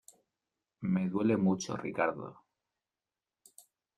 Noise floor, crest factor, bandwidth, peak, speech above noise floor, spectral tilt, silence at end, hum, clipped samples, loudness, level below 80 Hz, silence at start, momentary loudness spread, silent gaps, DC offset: under -90 dBFS; 18 dB; 12 kHz; -16 dBFS; over 59 dB; -6.5 dB/octave; 1.65 s; none; under 0.1%; -32 LUFS; -72 dBFS; 0.8 s; 13 LU; none; under 0.1%